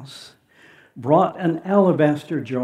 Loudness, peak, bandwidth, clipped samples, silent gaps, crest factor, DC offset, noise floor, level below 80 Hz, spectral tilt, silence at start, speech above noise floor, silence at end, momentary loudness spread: -19 LUFS; -2 dBFS; 13 kHz; under 0.1%; none; 18 dB; under 0.1%; -52 dBFS; -74 dBFS; -8 dB/octave; 0 s; 32 dB; 0 s; 17 LU